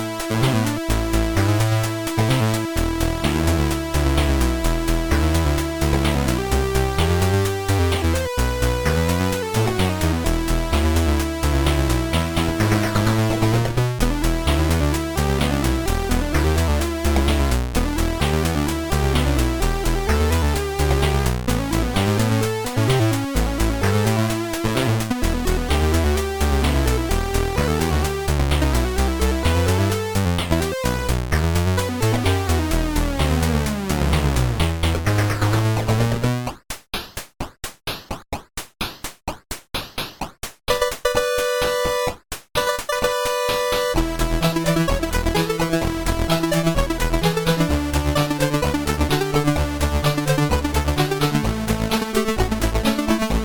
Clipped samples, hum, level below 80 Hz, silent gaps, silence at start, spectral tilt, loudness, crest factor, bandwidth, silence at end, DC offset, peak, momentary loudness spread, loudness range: under 0.1%; none; -26 dBFS; none; 0 s; -5.5 dB/octave; -21 LUFS; 14 dB; 19.5 kHz; 0 s; under 0.1%; -6 dBFS; 4 LU; 3 LU